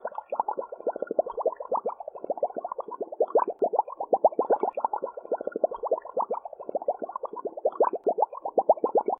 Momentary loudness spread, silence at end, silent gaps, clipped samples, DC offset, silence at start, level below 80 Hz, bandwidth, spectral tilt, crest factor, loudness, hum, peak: 11 LU; 0.05 s; none; under 0.1%; under 0.1%; 0 s; -76 dBFS; 3.4 kHz; -9.5 dB/octave; 20 dB; -29 LUFS; none; -8 dBFS